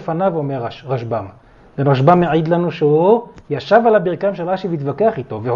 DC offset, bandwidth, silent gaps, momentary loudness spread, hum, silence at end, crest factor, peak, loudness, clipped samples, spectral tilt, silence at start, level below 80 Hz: under 0.1%; 7 kHz; none; 13 LU; none; 0 s; 16 dB; 0 dBFS; -16 LUFS; under 0.1%; -9 dB/octave; 0 s; -52 dBFS